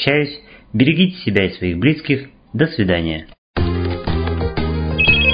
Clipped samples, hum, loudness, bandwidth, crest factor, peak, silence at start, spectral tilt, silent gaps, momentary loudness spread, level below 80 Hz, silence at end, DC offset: under 0.1%; none; -18 LUFS; 5.2 kHz; 18 dB; 0 dBFS; 0 s; -9 dB/octave; 3.38-3.54 s; 11 LU; -28 dBFS; 0 s; under 0.1%